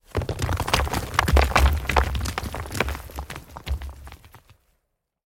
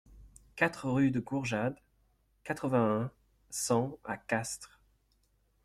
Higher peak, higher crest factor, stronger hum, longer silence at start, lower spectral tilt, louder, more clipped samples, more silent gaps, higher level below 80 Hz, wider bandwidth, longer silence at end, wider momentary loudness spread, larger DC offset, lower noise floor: first, -4 dBFS vs -14 dBFS; about the same, 22 dB vs 20 dB; neither; about the same, 0.15 s vs 0.1 s; about the same, -4.5 dB/octave vs -5.5 dB/octave; first, -24 LUFS vs -33 LUFS; neither; neither; first, -28 dBFS vs -62 dBFS; about the same, 17 kHz vs 15.5 kHz; about the same, 0.9 s vs 1 s; first, 17 LU vs 14 LU; neither; first, -76 dBFS vs -72 dBFS